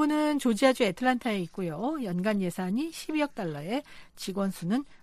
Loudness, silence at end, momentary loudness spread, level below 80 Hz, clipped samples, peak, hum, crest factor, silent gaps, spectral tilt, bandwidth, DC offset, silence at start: -29 LUFS; 0.05 s; 10 LU; -60 dBFS; under 0.1%; -10 dBFS; none; 18 dB; none; -5.5 dB/octave; 15 kHz; under 0.1%; 0 s